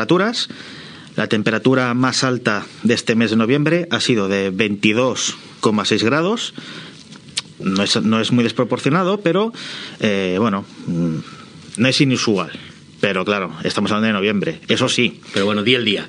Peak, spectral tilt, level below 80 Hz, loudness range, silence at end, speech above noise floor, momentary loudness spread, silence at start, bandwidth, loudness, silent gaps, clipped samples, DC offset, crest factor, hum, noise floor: 0 dBFS; -4.5 dB/octave; -62 dBFS; 3 LU; 0 s; 21 dB; 12 LU; 0 s; 10.5 kHz; -18 LUFS; none; under 0.1%; under 0.1%; 18 dB; none; -39 dBFS